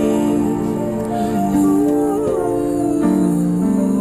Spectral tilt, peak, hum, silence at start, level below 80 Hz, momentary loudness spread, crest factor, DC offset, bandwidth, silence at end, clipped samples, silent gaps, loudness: -7.5 dB/octave; -4 dBFS; none; 0 s; -42 dBFS; 5 LU; 12 dB; under 0.1%; 14.5 kHz; 0 s; under 0.1%; none; -17 LUFS